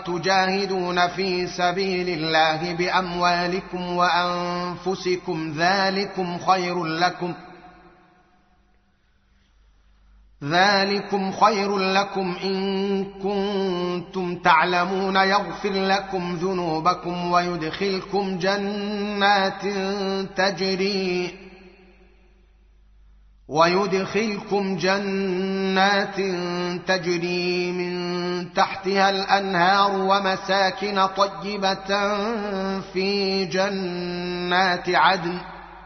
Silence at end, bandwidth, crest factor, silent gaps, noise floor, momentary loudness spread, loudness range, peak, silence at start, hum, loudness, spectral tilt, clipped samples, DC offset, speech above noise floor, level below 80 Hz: 0 s; 6.4 kHz; 20 dB; none; -62 dBFS; 8 LU; 5 LU; -2 dBFS; 0 s; none; -22 LUFS; -3 dB/octave; under 0.1%; under 0.1%; 39 dB; -56 dBFS